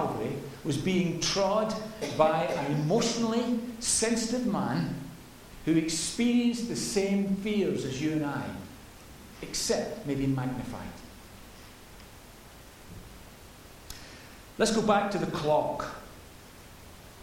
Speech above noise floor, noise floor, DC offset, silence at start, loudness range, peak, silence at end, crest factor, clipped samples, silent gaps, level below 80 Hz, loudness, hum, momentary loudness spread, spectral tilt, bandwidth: 22 dB; -50 dBFS; under 0.1%; 0 s; 10 LU; -8 dBFS; 0 s; 22 dB; under 0.1%; none; -54 dBFS; -29 LUFS; none; 23 LU; -4.5 dB/octave; 16.5 kHz